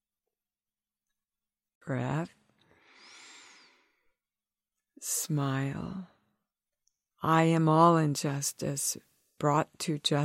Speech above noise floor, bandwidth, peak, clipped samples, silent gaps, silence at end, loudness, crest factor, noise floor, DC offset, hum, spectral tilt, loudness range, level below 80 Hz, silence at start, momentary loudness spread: over 62 dB; 16 kHz; -8 dBFS; under 0.1%; none; 0 s; -29 LUFS; 24 dB; under -90 dBFS; under 0.1%; none; -5 dB/octave; 13 LU; -70 dBFS; 1.85 s; 18 LU